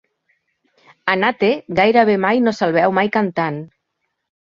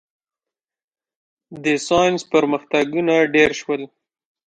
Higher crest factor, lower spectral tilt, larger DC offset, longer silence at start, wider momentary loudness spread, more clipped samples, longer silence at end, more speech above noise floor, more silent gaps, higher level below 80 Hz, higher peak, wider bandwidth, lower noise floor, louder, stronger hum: about the same, 18 dB vs 18 dB; first, -6.5 dB/octave vs -4.5 dB/octave; neither; second, 1.05 s vs 1.5 s; about the same, 9 LU vs 10 LU; neither; first, 0.8 s vs 0.65 s; second, 58 dB vs 71 dB; neither; about the same, -58 dBFS vs -56 dBFS; about the same, -2 dBFS vs -2 dBFS; second, 7.4 kHz vs 9.4 kHz; second, -74 dBFS vs -89 dBFS; about the same, -16 LUFS vs -18 LUFS; neither